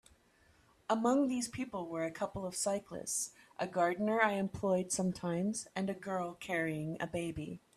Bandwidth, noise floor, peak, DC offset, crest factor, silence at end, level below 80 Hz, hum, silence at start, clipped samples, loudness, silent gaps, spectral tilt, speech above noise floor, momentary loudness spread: 15 kHz; -68 dBFS; -14 dBFS; under 0.1%; 22 dB; 0.2 s; -66 dBFS; none; 0.9 s; under 0.1%; -36 LUFS; none; -4.5 dB/octave; 32 dB; 9 LU